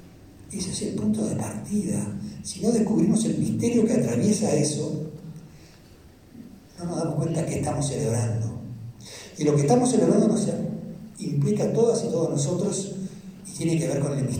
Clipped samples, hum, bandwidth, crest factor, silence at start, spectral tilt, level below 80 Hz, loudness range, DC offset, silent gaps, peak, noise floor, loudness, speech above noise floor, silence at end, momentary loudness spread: under 0.1%; none; 15.5 kHz; 18 dB; 0 s; -6 dB/octave; -56 dBFS; 6 LU; under 0.1%; none; -8 dBFS; -50 dBFS; -25 LUFS; 27 dB; 0 s; 17 LU